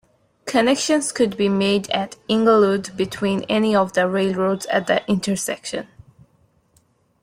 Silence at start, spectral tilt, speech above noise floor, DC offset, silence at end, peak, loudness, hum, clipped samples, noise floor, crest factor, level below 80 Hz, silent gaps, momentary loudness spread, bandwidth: 0.45 s; -4.5 dB/octave; 42 dB; under 0.1%; 1.4 s; -4 dBFS; -20 LUFS; none; under 0.1%; -61 dBFS; 16 dB; -58 dBFS; none; 8 LU; 16 kHz